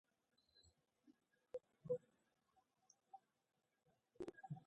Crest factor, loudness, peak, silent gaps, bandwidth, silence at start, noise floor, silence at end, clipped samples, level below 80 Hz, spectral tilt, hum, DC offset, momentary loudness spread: 24 dB; -53 LUFS; -34 dBFS; none; 8.2 kHz; 0.55 s; -84 dBFS; 0.05 s; under 0.1%; -88 dBFS; -7.5 dB/octave; none; under 0.1%; 18 LU